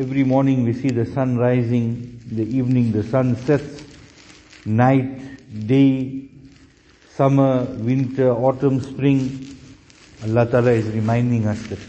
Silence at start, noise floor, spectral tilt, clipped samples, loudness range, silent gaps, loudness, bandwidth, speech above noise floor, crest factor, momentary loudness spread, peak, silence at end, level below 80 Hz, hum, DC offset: 0 s; -51 dBFS; -9 dB/octave; under 0.1%; 2 LU; none; -19 LUFS; 8.2 kHz; 32 dB; 18 dB; 15 LU; -2 dBFS; 0 s; -50 dBFS; none; under 0.1%